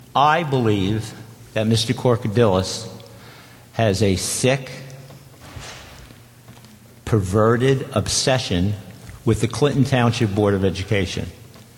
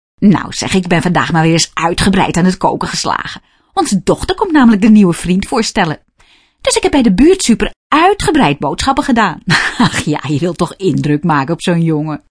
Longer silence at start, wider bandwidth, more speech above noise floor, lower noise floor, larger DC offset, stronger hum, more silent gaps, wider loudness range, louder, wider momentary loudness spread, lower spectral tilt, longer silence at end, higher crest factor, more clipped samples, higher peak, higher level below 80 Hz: about the same, 0.15 s vs 0.2 s; first, 16.5 kHz vs 11 kHz; second, 26 dB vs 38 dB; second, -45 dBFS vs -49 dBFS; neither; neither; second, none vs 7.76-7.90 s; first, 5 LU vs 2 LU; second, -20 LUFS vs -12 LUFS; first, 19 LU vs 8 LU; about the same, -5 dB/octave vs -5 dB/octave; about the same, 0.15 s vs 0.15 s; first, 18 dB vs 12 dB; neither; second, -4 dBFS vs 0 dBFS; second, -46 dBFS vs -32 dBFS